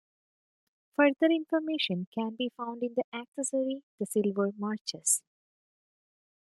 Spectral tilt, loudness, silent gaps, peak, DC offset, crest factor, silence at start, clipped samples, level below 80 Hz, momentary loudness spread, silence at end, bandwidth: -3.5 dB/octave; -30 LUFS; 2.07-2.12 s, 3.04-3.12 s, 3.28-3.32 s, 3.83-3.98 s, 4.81-4.85 s; -10 dBFS; under 0.1%; 22 dB; 1 s; under 0.1%; -84 dBFS; 9 LU; 1.3 s; 12.5 kHz